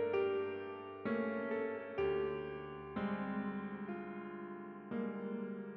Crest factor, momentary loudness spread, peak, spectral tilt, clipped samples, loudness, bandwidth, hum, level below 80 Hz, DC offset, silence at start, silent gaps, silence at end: 14 dB; 10 LU; -26 dBFS; -6 dB/octave; under 0.1%; -41 LUFS; 5.6 kHz; none; -68 dBFS; under 0.1%; 0 s; none; 0 s